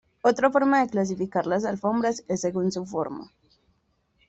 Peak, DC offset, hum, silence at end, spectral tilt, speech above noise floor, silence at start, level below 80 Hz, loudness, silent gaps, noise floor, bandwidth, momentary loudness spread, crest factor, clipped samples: -8 dBFS; under 0.1%; none; 1 s; -5.5 dB/octave; 45 dB; 0.25 s; -64 dBFS; -25 LUFS; none; -69 dBFS; 8.2 kHz; 10 LU; 18 dB; under 0.1%